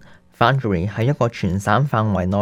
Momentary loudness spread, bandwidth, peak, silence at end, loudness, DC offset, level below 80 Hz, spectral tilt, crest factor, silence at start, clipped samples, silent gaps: 4 LU; 13.5 kHz; 0 dBFS; 0 s; -19 LUFS; under 0.1%; -44 dBFS; -7 dB/octave; 18 dB; 0.4 s; under 0.1%; none